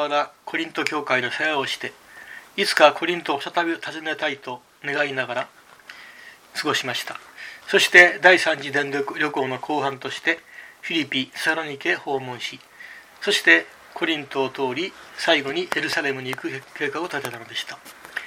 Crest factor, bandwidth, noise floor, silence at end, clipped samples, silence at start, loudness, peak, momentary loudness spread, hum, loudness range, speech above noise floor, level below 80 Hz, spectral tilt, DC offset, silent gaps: 24 dB; 16.5 kHz; -45 dBFS; 0 s; under 0.1%; 0 s; -21 LUFS; 0 dBFS; 20 LU; none; 9 LU; 23 dB; -70 dBFS; -3 dB/octave; under 0.1%; none